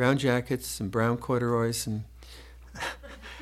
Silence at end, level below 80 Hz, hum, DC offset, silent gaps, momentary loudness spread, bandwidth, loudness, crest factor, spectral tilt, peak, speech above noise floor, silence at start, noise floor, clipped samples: 0 s; -50 dBFS; none; under 0.1%; none; 21 LU; 15.5 kHz; -29 LUFS; 20 dB; -5.5 dB/octave; -10 dBFS; 20 dB; 0 s; -47 dBFS; under 0.1%